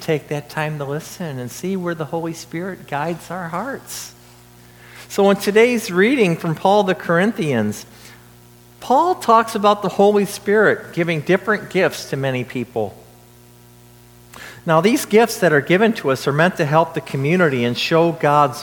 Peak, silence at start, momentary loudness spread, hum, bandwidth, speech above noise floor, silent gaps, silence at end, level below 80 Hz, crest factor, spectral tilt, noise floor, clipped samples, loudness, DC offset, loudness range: 0 dBFS; 0 s; 13 LU; 60 Hz at -45 dBFS; 19 kHz; 28 dB; none; 0 s; -58 dBFS; 18 dB; -5.5 dB/octave; -46 dBFS; under 0.1%; -18 LUFS; under 0.1%; 9 LU